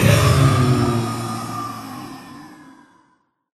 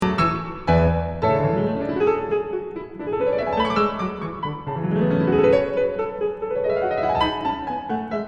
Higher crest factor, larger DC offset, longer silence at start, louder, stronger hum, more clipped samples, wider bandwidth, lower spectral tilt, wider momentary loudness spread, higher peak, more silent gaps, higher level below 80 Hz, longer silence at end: about the same, 20 dB vs 16 dB; neither; about the same, 0 s vs 0 s; first, -18 LUFS vs -22 LUFS; neither; neither; first, 14 kHz vs 8.8 kHz; second, -6 dB/octave vs -8 dB/octave; first, 23 LU vs 10 LU; first, 0 dBFS vs -6 dBFS; neither; about the same, -38 dBFS vs -40 dBFS; first, 1 s vs 0 s